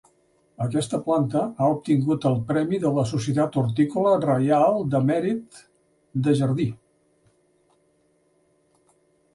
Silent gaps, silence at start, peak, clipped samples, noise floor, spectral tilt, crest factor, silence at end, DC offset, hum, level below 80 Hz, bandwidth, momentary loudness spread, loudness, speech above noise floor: none; 0.6 s; -8 dBFS; under 0.1%; -65 dBFS; -7.5 dB/octave; 16 dB; 2.6 s; under 0.1%; none; -60 dBFS; 11.5 kHz; 7 LU; -23 LUFS; 43 dB